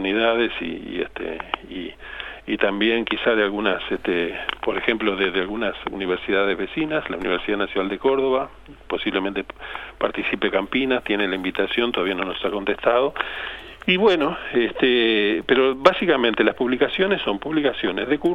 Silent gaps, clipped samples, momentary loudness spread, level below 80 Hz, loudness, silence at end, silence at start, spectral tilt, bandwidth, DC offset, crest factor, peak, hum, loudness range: none; under 0.1%; 11 LU; -48 dBFS; -22 LUFS; 0 s; 0 s; -6 dB/octave; 7.2 kHz; under 0.1%; 22 dB; 0 dBFS; none; 5 LU